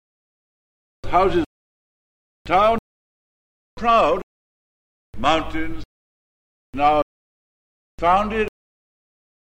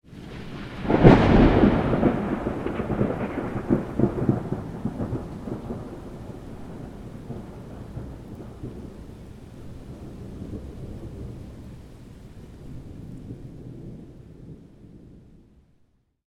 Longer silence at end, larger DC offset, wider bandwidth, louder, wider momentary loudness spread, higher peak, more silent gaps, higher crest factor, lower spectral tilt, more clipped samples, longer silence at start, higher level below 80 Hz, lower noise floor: about the same, 1.05 s vs 1.1 s; neither; about the same, 10.5 kHz vs 11.5 kHz; first, -20 LUFS vs -23 LUFS; second, 14 LU vs 25 LU; second, -4 dBFS vs 0 dBFS; first, 1.46-2.45 s, 2.79-3.77 s, 4.23-5.13 s, 5.85-6.73 s, 7.02-7.98 s vs none; second, 20 dB vs 26 dB; second, -5.5 dB/octave vs -8.5 dB/octave; neither; first, 1.05 s vs 0.1 s; about the same, -40 dBFS vs -36 dBFS; first, under -90 dBFS vs -64 dBFS